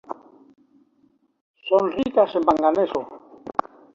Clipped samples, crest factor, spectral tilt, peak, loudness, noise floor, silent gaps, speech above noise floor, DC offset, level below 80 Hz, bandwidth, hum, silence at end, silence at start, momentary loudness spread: under 0.1%; 22 dB; -6.5 dB/octave; -2 dBFS; -22 LUFS; -63 dBFS; 1.41-1.54 s; 43 dB; under 0.1%; -60 dBFS; 7.4 kHz; none; 0.45 s; 0.1 s; 20 LU